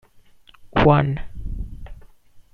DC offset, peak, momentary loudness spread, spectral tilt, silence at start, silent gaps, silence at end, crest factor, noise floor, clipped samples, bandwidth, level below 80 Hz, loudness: under 0.1%; -2 dBFS; 21 LU; -9 dB/octave; 0.6 s; none; 0.15 s; 20 dB; -50 dBFS; under 0.1%; 5.2 kHz; -36 dBFS; -19 LUFS